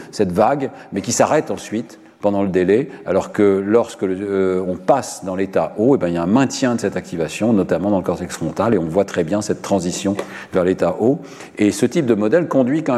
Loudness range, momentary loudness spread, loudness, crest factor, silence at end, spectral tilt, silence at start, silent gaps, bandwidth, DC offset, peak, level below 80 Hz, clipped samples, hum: 1 LU; 8 LU; -18 LUFS; 16 dB; 0 s; -6 dB/octave; 0 s; none; 14 kHz; under 0.1%; -2 dBFS; -54 dBFS; under 0.1%; none